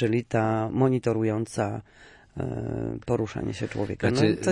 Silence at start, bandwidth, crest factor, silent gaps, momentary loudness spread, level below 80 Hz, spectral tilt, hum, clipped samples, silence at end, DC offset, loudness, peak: 0 s; 11.5 kHz; 18 dB; none; 9 LU; -52 dBFS; -7 dB/octave; none; under 0.1%; 0 s; under 0.1%; -27 LUFS; -8 dBFS